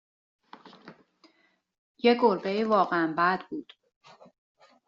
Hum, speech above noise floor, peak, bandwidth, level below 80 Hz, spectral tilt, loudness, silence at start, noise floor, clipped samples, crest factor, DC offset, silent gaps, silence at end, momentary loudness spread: none; 44 dB; -10 dBFS; 7.2 kHz; -76 dBFS; -3 dB/octave; -25 LUFS; 0.65 s; -69 dBFS; under 0.1%; 20 dB; under 0.1%; 1.78-1.95 s; 1.25 s; 12 LU